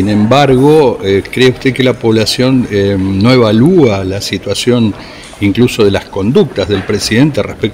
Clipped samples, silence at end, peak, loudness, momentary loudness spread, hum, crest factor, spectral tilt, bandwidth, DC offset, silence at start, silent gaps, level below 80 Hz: 0.6%; 0 s; 0 dBFS; -10 LUFS; 8 LU; none; 10 dB; -6 dB/octave; 16.5 kHz; under 0.1%; 0 s; none; -38 dBFS